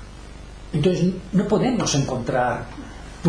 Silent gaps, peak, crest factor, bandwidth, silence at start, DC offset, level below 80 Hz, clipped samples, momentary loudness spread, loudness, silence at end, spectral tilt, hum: none; -6 dBFS; 16 dB; 10.5 kHz; 0 s; under 0.1%; -40 dBFS; under 0.1%; 21 LU; -22 LUFS; 0 s; -5.5 dB/octave; none